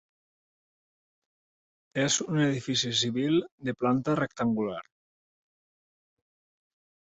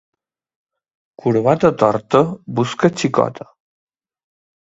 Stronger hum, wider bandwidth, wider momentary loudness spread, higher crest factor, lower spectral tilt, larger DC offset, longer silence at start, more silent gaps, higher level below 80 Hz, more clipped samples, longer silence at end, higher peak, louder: neither; about the same, 8.2 kHz vs 8 kHz; about the same, 8 LU vs 8 LU; about the same, 18 dB vs 20 dB; second, -4 dB/octave vs -6.5 dB/octave; neither; first, 1.95 s vs 1.25 s; first, 3.52-3.58 s vs none; second, -68 dBFS vs -56 dBFS; neither; first, 2.2 s vs 1.3 s; second, -14 dBFS vs 0 dBFS; second, -28 LUFS vs -17 LUFS